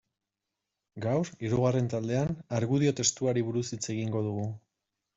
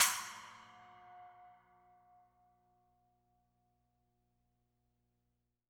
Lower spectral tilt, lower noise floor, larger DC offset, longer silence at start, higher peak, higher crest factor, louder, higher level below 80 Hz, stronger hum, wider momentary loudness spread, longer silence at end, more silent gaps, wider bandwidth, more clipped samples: first, -5.5 dB/octave vs 2.5 dB/octave; about the same, -87 dBFS vs -84 dBFS; neither; first, 0.95 s vs 0 s; about the same, -12 dBFS vs -14 dBFS; second, 18 dB vs 32 dB; first, -30 LUFS vs -37 LUFS; first, -62 dBFS vs -84 dBFS; second, none vs 60 Hz at -85 dBFS; second, 8 LU vs 22 LU; second, 0.6 s vs 4.4 s; neither; second, 8 kHz vs over 20 kHz; neither